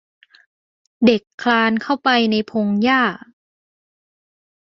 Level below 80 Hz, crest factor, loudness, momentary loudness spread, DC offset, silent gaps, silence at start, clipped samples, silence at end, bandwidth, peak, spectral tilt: -62 dBFS; 18 dB; -17 LUFS; 5 LU; under 0.1%; 1.34-1.38 s; 1 s; under 0.1%; 1.5 s; 7 kHz; -2 dBFS; -6 dB/octave